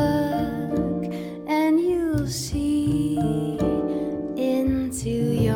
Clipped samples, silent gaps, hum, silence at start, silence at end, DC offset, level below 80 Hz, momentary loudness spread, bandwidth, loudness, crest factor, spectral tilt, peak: under 0.1%; none; none; 0 s; 0 s; under 0.1%; -40 dBFS; 6 LU; 17 kHz; -24 LUFS; 14 dB; -6.5 dB/octave; -8 dBFS